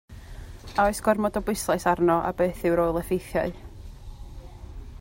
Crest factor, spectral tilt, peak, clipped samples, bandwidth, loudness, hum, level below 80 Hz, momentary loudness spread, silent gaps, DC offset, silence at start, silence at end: 18 dB; -5.5 dB/octave; -8 dBFS; under 0.1%; 16.5 kHz; -25 LUFS; none; -42 dBFS; 22 LU; none; under 0.1%; 0.1 s; 0 s